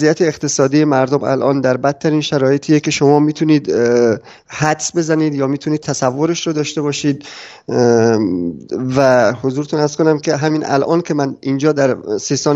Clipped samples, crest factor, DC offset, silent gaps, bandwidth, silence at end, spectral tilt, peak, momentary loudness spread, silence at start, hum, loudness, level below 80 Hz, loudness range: under 0.1%; 14 dB; under 0.1%; none; 8.2 kHz; 0 s; -5.5 dB/octave; 0 dBFS; 7 LU; 0 s; none; -15 LUFS; -56 dBFS; 3 LU